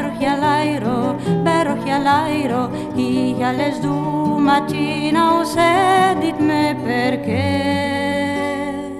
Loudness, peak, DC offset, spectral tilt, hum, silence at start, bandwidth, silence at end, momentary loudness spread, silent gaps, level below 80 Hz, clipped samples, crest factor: -18 LUFS; -2 dBFS; under 0.1%; -6 dB/octave; none; 0 s; 14 kHz; 0 s; 6 LU; none; -48 dBFS; under 0.1%; 14 dB